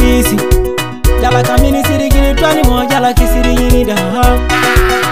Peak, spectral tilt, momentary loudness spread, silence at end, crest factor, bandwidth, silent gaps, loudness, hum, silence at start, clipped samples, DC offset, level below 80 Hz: 0 dBFS; -5 dB/octave; 3 LU; 0 s; 10 dB; 16.5 kHz; none; -11 LUFS; none; 0 s; 0.6%; 4%; -14 dBFS